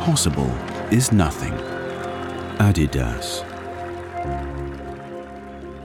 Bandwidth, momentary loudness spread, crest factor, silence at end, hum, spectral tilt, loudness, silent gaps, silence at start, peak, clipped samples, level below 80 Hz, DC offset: 18 kHz; 16 LU; 16 dB; 0 s; none; -5 dB/octave; -23 LUFS; none; 0 s; -6 dBFS; under 0.1%; -34 dBFS; under 0.1%